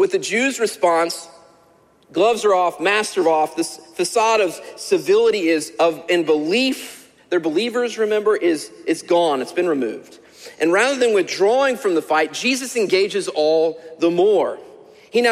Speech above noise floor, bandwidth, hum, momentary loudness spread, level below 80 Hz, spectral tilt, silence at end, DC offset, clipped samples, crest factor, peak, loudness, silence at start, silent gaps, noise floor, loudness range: 36 dB; 15.5 kHz; none; 8 LU; -68 dBFS; -3 dB/octave; 0 s; under 0.1%; under 0.1%; 14 dB; -4 dBFS; -19 LUFS; 0 s; none; -54 dBFS; 2 LU